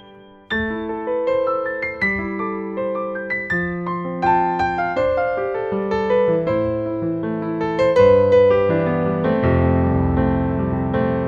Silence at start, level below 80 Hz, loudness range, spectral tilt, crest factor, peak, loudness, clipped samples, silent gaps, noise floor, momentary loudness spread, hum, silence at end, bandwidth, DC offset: 0.05 s; -38 dBFS; 6 LU; -8.5 dB/octave; 16 dB; -2 dBFS; -19 LUFS; under 0.1%; none; -44 dBFS; 10 LU; none; 0 s; 7 kHz; under 0.1%